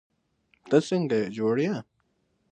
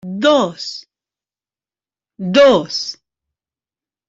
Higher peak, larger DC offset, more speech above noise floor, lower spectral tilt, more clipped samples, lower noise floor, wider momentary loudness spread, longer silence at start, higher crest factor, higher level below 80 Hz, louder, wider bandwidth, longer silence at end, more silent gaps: second, -8 dBFS vs -2 dBFS; neither; second, 47 dB vs over 76 dB; first, -6.5 dB/octave vs -4.5 dB/octave; neither; second, -72 dBFS vs under -90 dBFS; second, 6 LU vs 17 LU; first, 0.65 s vs 0.05 s; about the same, 20 dB vs 16 dB; second, -72 dBFS vs -60 dBFS; second, -26 LUFS vs -14 LUFS; first, 9.4 kHz vs 7.8 kHz; second, 0.7 s vs 1.15 s; neither